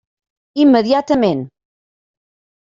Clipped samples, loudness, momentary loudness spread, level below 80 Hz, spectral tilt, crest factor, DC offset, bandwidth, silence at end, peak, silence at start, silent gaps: under 0.1%; -14 LUFS; 15 LU; -54 dBFS; -7 dB/octave; 16 dB; under 0.1%; 7.4 kHz; 1.15 s; -2 dBFS; 0.55 s; none